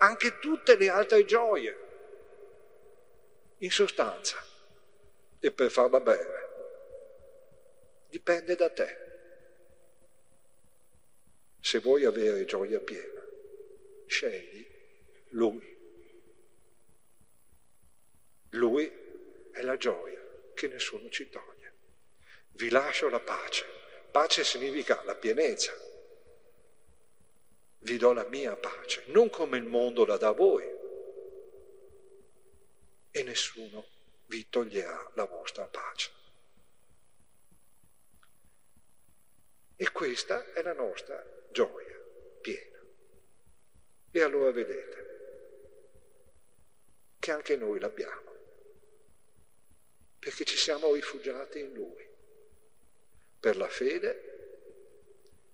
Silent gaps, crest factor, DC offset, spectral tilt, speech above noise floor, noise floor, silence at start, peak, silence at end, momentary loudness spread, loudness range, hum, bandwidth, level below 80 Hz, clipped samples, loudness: none; 28 dB; 0.2%; -2.5 dB/octave; 40 dB; -70 dBFS; 0 s; -4 dBFS; 0.8 s; 23 LU; 10 LU; none; 11 kHz; -74 dBFS; under 0.1%; -30 LUFS